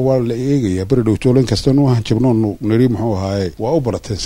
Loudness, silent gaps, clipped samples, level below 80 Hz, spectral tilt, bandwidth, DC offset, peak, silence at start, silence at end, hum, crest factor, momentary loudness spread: -15 LUFS; none; under 0.1%; -36 dBFS; -7.5 dB/octave; 12.5 kHz; under 0.1%; 0 dBFS; 0 s; 0 s; none; 14 dB; 5 LU